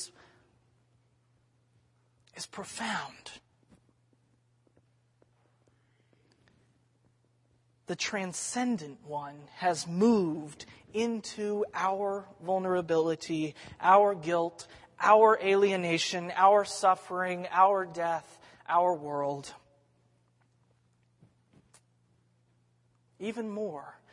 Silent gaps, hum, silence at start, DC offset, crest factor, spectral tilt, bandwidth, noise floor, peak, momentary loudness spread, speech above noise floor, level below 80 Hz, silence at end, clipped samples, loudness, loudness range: none; none; 0 s; under 0.1%; 24 dB; -4.5 dB/octave; 11.5 kHz; -70 dBFS; -8 dBFS; 18 LU; 41 dB; -76 dBFS; 0.2 s; under 0.1%; -29 LUFS; 17 LU